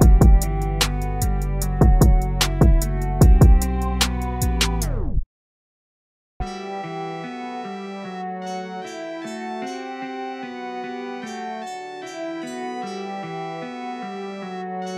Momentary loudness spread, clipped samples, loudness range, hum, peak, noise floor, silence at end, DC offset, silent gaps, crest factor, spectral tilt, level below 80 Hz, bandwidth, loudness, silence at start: 15 LU; under 0.1%; 13 LU; none; 0 dBFS; under -90 dBFS; 0 s; under 0.1%; 5.26-6.40 s; 20 dB; -5.5 dB/octave; -22 dBFS; 16 kHz; -23 LUFS; 0 s